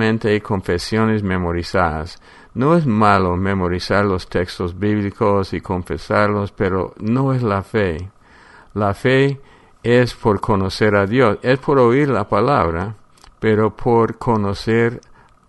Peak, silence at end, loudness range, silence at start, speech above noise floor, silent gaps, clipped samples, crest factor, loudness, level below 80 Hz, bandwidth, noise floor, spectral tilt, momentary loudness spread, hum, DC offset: 0 dBFS; 0.5 s; 3 LU; 0 s; 29 dB; none; under 0.1%; 18 dB; -18 LUFS; -40 dBFS; 11.5 kHz; -46 dBFS; -7 dB/octave; 9 LU; none; under 0.1%